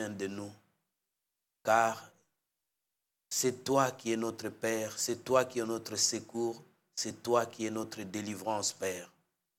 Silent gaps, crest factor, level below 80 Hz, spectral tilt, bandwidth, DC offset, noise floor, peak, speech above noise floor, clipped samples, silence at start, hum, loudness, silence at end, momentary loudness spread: none; 22 dB; -80 dBFS; -3 dB/octave; 17.5 kHz; under 0.1%; -87 dBFS; -12 dBFS; 54 dB; under 0.1%; 0 s; none; -33 LUFS; 0.5 s; 10 LU